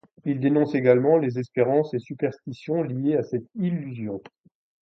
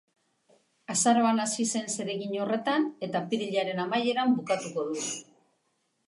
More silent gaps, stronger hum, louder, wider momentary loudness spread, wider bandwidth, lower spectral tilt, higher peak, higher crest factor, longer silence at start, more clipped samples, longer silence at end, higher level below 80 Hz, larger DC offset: neither; neither; first, -24 LUFS vs -28 LUFS; first, 13 LU vs 9 LU; second, 6.4 kHz vs 11.5 kHz; first, -9.5 dB/octave vs -3.5 dB/octave; first, -4 dBFS vs -10 dBFS; about the same, 20 dB vs 18 dB; second, 0.25 s vs 0.9 s; neither; second, 0.65 s vs 0.85 s; first, -68 dBFS vs -80 dBFS; neither